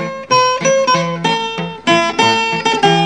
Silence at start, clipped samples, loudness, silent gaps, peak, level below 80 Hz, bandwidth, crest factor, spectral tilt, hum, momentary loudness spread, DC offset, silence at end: 0 s; under 0.1%; -14 LUFS; none; 0 dBFS; -54 dBFS; 10 kHz; 14 dB; -3.5 dB/octave; none; 5 LU; 0.3%; 0 s